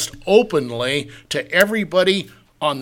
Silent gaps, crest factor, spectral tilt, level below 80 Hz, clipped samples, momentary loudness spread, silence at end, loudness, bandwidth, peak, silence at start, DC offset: none; 18 dB; -4 dB/octave; -52 dBFS; under 0.1%; 9 LU; 0 s; -18 LUFS; 17 kHz; 0 dBFS; 0 s; under 0.1%